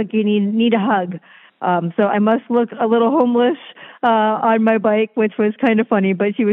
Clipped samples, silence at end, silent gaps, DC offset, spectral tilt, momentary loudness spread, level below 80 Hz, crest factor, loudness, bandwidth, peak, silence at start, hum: under 0.1%; 0 s; none; under 0.1%; -9.5 dB/octave; 5 LU; -74 dBFS; 14 dB; -17 LUFS; 4 kHz; -2 dBFS; 0 s; none